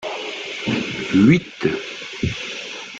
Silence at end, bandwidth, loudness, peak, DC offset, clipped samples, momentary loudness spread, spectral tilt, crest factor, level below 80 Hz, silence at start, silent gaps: 0 s; 8.8 kHz; -21 LUFS; -2 dBFS; under 0.1%; under 0.1%; 13 LU; -6 dB/octave; 18 dB; -48 dBFS; 0 s; none